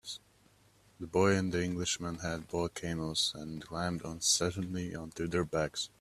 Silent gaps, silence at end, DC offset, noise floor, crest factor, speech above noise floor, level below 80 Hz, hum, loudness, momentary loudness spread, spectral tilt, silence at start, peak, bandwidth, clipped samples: none; 0.15 s; under 0.1%; -65 dBFS; 20 dB; 32 dB; -60 dBFS; none; -33 LUFS; 12 LU; -3.5 dB/octave; 0.05 s; -14 dBFS; 14.5 kHz; under 0.1%